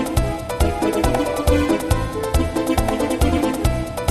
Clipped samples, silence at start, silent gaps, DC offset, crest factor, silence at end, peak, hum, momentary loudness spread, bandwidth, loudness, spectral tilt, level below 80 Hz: under 0.1%; 0 s; none; under 0.1%; 16 dB; 0 s; -4 dBFS; none; 4 LU; 15.5 kHz; -20 LUFS; -6 dB/octave; -24 dBFS